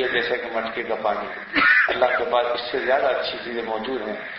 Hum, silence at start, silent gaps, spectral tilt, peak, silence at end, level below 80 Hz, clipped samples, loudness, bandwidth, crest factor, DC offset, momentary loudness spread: none; 0 s; none; -6 dB/octave; -6 dBFS; 0 s; -56 dBFS; under 0.1%; -22 LUFS; 6 kHz; 16 dB; under 0.1%; 11 LU